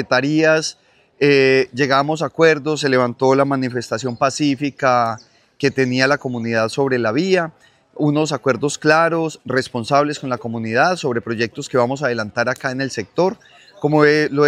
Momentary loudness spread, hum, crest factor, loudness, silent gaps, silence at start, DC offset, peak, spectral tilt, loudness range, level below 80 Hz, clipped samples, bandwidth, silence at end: 8 LU; none; 18 dB; -18 LUFS; none; 0 s; under 0.1%; 0 dBFS; -5 dB/octave; 3 LU; -64 dBFS; under 0.1%; 12.5 kHz; 0 s